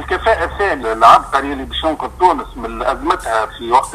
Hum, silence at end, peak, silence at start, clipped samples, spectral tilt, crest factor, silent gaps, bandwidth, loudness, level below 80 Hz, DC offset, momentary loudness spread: none; 0 s; 0 dBFS; 0 s; 0.2%; -4 dB/octave; 16 dB; none; 15 kHz; -15 LUFS; -34 dBFS; under 0.1%; 11 LU